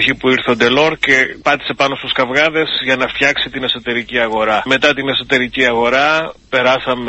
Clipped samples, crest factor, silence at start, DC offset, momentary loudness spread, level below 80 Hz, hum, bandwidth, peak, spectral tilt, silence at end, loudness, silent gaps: under 0.1%; 14 dB; 0 s; under 0.1%; 5 LU; -46 dBFS; none; 8.4 kHz; 0 dBFS; -4 dB/octave; 0 s; -14 LUFS; none